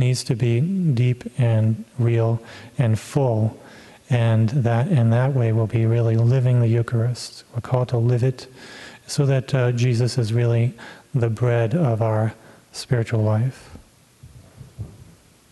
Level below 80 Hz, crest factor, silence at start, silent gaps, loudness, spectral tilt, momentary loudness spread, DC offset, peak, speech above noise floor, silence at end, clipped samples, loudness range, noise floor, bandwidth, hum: -54 dBFS; 16 dB; 0 s; none; -21 LUFS; -7.5 dB/octave; 14 LU; under 0.1%; -4 dBFS; 29 dB; 0.6 s; under 0.1%; 4 LU; -49 dBFS; 12 kHz; none